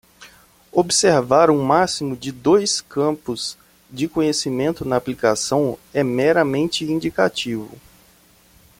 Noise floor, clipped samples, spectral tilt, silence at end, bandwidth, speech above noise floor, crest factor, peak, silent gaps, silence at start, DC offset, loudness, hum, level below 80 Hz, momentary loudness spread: -53 dBFS; under 0.1%; -4 dB/octave; 1.05 s; 16.5 kHz; 34 dB; 18 dB; -2 dBFS; none; 0.2 s; under 0.1%; -19 LUFS; none; -54 dBFS; 12 LU